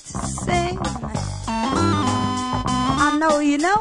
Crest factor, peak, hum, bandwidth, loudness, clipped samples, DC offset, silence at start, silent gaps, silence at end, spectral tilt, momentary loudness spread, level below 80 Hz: 16 dB; -4 dBFS; none; 11 kHz; -21 LUFS; under 0.1%; under 0.1%; 0.05 s; none; 0 s; -5 dB/octave; 9 LU; -38 dBFS